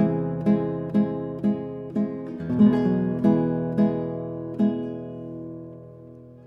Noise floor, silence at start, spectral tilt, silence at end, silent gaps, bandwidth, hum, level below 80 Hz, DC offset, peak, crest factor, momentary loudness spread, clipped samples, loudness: -45 dBFS; 0 s; -10.5 dB/octave; 0.05 s; none; 5.2 kHz; none; -56 dBFS; under 0.1%; -8 dBFS; 16 dB; 17 LU; under 0.1%; -24 LUFS